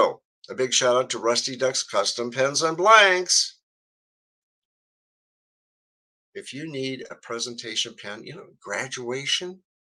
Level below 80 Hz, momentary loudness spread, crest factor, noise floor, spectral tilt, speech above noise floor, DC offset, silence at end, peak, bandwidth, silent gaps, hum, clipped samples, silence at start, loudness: -78 dBFS; 22 LU; 24 dB; under -90 dBFS; -1.5 dB/octave; over 66 dB; under 0.1%; 0.3 s; -2 dBFS; 12.5 kHz; 0.25-0.42 s, 3.63-6.33 s; none; under 0.1%; 0 s; -22 LUFS